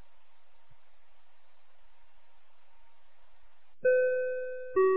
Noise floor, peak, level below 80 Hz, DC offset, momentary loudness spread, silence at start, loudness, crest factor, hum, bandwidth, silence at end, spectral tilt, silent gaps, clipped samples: -70 dBFS; -16 dBFS; -74 dBFS; 0.8%; 8 LU; 3.85 s; -30 LUFS; 18 dB; none; 4 kHz; 0 s; -5 dB/octave; none; under 0.1%